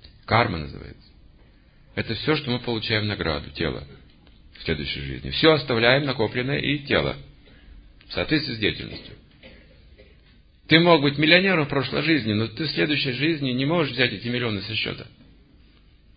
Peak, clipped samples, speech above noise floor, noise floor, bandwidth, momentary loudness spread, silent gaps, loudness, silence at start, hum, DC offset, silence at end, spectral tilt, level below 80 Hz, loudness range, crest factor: -2 dBFS; under 0.1%; 31 dB; -54 dBFS; 5.2 kHz; 15 LU; none; -22 LUFS; 0.05 s; none; under 0.1%; 1.1 s; -10 dB/octave; -46 dBFS; 7 LU; 24 dB